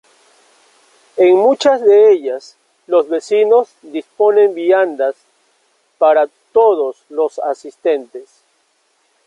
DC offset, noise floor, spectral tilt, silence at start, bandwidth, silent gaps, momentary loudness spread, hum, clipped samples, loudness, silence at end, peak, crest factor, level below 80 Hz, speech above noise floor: under 0.1%; -61 dBFS; -4 dB/octave; 1.15 s; 9.4 kHz; none; 14 LU; none; under 0.1%; -14 LUFS; 1.05 s; -2 dBFS; 14 dB; -68 dBFS; 48 dB